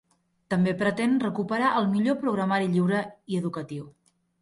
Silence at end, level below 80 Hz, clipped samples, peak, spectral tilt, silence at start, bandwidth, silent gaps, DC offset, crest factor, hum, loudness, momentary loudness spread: 0.5 s; -66 dBFS; under 0.1%; -12 dBFS; -7 dB/octave; 0.5 s; 11.5 kHz; none; under 0.1%; 14 dB; none; -26 LUFS; 8 LU